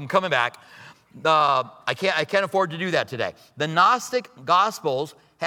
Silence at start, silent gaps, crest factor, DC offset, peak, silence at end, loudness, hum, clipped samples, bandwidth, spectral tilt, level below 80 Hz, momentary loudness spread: 0 s; none; 18 dB; under 0.1%; -4 dBFS; 0 s; -22 LUFS; none; under 0.1%; 18 kHz; -4 dB/octave; -74 dBFS; 10 LU